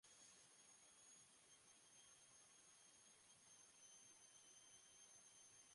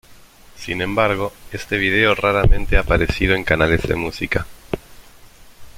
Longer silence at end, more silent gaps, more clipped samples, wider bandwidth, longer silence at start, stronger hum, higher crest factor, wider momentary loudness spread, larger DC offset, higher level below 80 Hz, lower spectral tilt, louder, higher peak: about the same, 0 s vs 0 s; neither; neither; second, 11.5 kHz vs 16 kHz; about the same, 0.05 s vs 0.1 s; neither; about the same, 14 dB vs 18 dB; second, 3 LU vs 14 LU; neither; second, under -90 dBFS vs -26 dBFS; second, 0 dB/octave vs -6 dB/octave; second, -67 LUFS vs -18 LUFS; second, -56 dBFS vs -2 dBFS